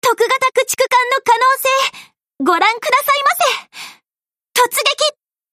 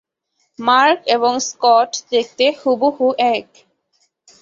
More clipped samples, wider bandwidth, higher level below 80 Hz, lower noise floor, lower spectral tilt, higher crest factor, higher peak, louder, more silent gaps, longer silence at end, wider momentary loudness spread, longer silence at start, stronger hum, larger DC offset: neither; first, 15.5 kHz vs 7.6 kHz; about the same, -68 dBFS vs -66 dBFS; first, under -90 dBFS vs -68 dBFS; second, 0 dB/octave vs -1.5 dB/octave; about the same, 14 dB vs 16 dB; about the same, -2 dBFS vs -2 dBFS; about the same, -14 LUFS vs -16 LUFS; neither; second, 0.4 s vs 1 s; about the same, 8 LU vs 6 LU; second, 0.05 s vs 0.6 s; neither; neither